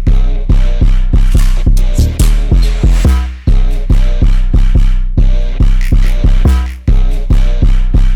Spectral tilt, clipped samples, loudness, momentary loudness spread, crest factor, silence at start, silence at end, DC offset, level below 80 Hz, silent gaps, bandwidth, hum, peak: -6.5 dB/octave; under 0.1%; -13 LUFS; 3 LU; 6 dB; 0 s; 0 s; under 0.1%; -8 dBFS; none; 11.5 kHz; none; -2 dBFS